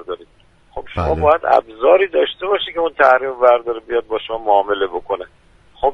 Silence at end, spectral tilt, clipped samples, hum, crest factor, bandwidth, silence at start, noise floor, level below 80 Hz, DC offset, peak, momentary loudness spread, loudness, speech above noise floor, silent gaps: 0 s; -6.5 dB/octave; under 0.1%; none; 16 dB; 6 kHz; 0.1 s; -51 dBFS; -40 dBFS; under 0.1%; 0 dBFS; 14 LU; -16 LUFS; 35 dB; none